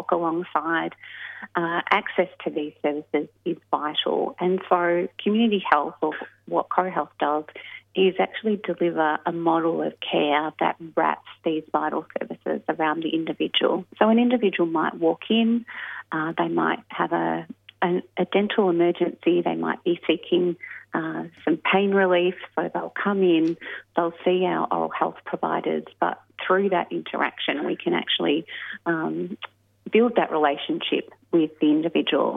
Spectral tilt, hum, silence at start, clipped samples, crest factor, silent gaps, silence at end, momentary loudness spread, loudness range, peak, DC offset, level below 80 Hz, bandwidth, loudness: -8 dB/octave; none; 0 s; under 0.1%; 22 dB; none; 0 s; 9 LU; 3 LU; -2 dBFS; under 0.1%; -76 dBFS; 4.4 kHz; -24 LUFS